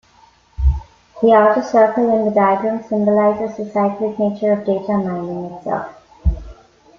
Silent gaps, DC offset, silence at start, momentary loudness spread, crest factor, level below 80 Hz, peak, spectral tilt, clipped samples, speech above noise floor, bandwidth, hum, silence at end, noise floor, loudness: none; under 0.1%; 0.6 s; 11 LU; 16 dB; -28 dBFS; -2 dBFS; -8.5 dB/octave; under 0.1%; 35 dB; 7 kHz; none; 0.45 s; -51 dBFS; -17 LUFS